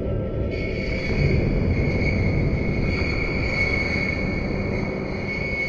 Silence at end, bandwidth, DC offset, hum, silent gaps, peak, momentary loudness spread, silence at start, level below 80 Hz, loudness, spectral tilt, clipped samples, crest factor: 0 s; 7.2 kHz; under 0.1%; none; none; -6 dBFS; 5 LU; 0 s; -30 dBFS; -24 LUFS; -7.5 dB/octave; under 0.1%; 16 dB